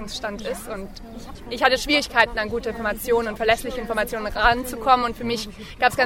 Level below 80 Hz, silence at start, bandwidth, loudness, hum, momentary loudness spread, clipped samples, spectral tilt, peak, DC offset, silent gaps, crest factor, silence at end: -40 dBFS; 0 s; 17 kHz; -22 LUFS; none; 15 LU; under 0.1%; -3 dB/octave; 0 dBFS; under 0.1%; none; 22 dB; 0 s